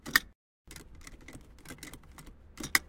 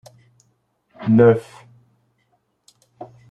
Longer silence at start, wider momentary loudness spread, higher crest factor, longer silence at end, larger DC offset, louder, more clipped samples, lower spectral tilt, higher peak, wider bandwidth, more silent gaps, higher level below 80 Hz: second, 0.05 s vs 1 s; second, 24 LU vs 28 LU; first, 32 dB vs 22 dB; second, 0.05 s vs 0.25 s; neither; second, -33 LUFS vs -16 LUFS; neither; second, -1 dB/octave vs -9.5 dB/octave; second, -4 dBFS vs 0 dBFS; first, 17 kHz vs 9.8 kHz; first, 0.35-0.65 s vs none; first, -54 dBFS vs -62 dBFS